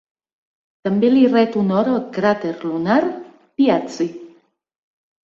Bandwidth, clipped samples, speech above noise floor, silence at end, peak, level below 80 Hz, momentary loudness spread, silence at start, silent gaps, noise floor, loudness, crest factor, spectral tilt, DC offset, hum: 7.4 kHz; under 0.1%; 35 dB; 0.95 s; -4 dBFS; -62 dBFS; 13 LU; 0.85 s; none; -52 dBFS; -18 LUFS; 16 dB; -7 dB/octave; under 0.1%; none